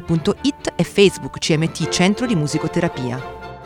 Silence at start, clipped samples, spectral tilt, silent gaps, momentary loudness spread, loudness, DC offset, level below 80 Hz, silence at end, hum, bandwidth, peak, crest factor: 0 s; under 0.1%; -5 dB/octave; none; 10 LU; -19 LUFS; under 0.1%; -44 dBFS; 0 s; none; 17 kHz; 0 dBFS; 20 dB